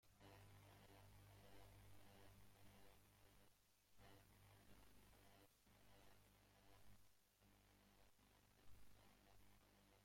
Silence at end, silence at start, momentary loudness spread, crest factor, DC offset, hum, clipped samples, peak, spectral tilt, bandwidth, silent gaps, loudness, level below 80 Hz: 0 s; 0 s; 1 LU; 16 dB; under 0.1%; 50 Hz at -75 dBFS; under 0.1%; -52 dBFS; -4 dB/octave; 16.5 kHz; none; -69 LUFS; -78 dBFS